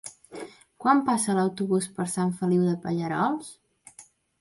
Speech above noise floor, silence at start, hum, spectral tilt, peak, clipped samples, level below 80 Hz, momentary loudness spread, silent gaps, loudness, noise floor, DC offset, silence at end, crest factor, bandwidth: 29 dB; 0.05 s; none; -6 dB/octave; -8 dBFS; under 0.1%; -68 dBFS; 19 LU; none; -26 LUFS; -54 dBFS; under 0.1%; 0.4 s; 20 dB; 11.5 kHz